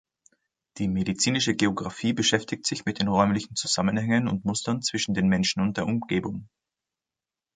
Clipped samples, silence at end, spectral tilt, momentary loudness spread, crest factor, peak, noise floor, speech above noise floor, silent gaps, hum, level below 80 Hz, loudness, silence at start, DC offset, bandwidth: under 0.1%; 1.1 s; -4 dB/octave; 6 LU; 20 dB; -6 dBFS; -90 dBFS; 65 dB; none; none; -54 dBFS; -25 LUFS; 0.75 s; under 0.1%; 9.6 kHz